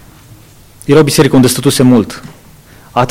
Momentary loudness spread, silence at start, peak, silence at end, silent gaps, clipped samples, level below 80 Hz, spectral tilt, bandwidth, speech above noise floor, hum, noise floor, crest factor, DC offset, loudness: 15 LU; 0.85 s; 0 dBFS; 0 s; none; under 0.1%; -40 dBFS; -5.5 dB/octave; 16.5 kHz; 30 dB; none; -38 dBFS; 12 dB; under 0.1%; -9 LUFS